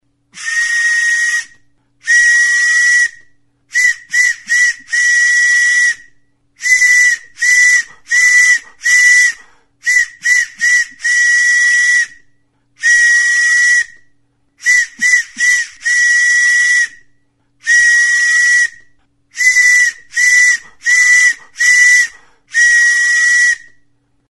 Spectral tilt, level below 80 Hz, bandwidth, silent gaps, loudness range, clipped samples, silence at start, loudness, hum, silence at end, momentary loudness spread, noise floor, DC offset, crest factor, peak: 4.5 dB/octave; -56 dBFS; 12 kHz; none; 2 LU; under 0.1%; 0.35 s; -9 LUFS; none; 0.75 s; 8 LU; -56 dBFS; under 0.1%; 12 dB; 0 dBFS